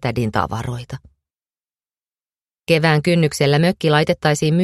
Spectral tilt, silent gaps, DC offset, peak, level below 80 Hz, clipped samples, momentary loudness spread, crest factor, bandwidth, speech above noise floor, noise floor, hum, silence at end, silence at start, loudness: -6 dB/octave; 2.07-2.11 s; under 0.1%; 0 dBFS; -46 dBFS; under 0.1%; 15 LU; 18 dB; 13 kHz; over 73 dB; under -90 dBFS; none; 0 s; 0 s; -17 LUFS